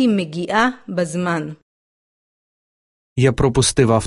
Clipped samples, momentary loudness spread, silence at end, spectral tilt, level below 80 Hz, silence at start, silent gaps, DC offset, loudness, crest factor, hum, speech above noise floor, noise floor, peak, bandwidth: under 0.1%; 9 LU; 0 s; -5 dB/octave; -40 dBFS; 0 s; 1.62-3.16 s; under 0.1%; -18 LUFS; 18 dB; none; over 73 dB; under -90 dBFS; -2 dBFS; 11.5 kHz